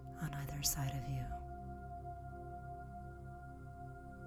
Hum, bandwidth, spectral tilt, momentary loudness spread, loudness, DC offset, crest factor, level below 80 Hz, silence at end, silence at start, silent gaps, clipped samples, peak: none; 20 kHz; -4 dB/octave; 15 LU; -44 LUFS; under 0.1%; 24 dB; -52 dBFS; 0 s; 0 s; none; under 0.1%; -22 dBFS